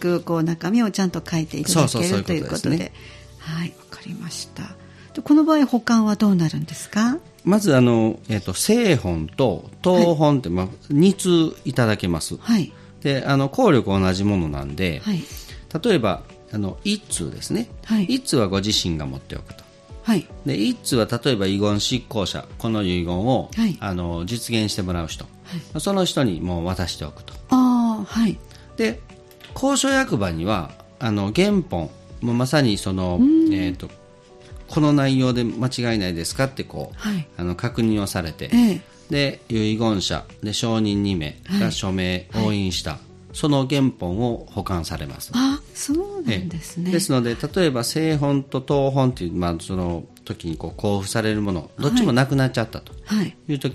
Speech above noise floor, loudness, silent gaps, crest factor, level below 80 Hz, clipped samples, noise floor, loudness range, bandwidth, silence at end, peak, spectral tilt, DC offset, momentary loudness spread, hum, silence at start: 26 dB; -21 LUFS; none; 18 dB; -44 dBFS; under 0.1%; -46 dBFS; 4 LU; 14.5 kHz; 0 s; -4 dBFS; -5.5 dB/octave; under 0.1%; 13 LU; none; 0 s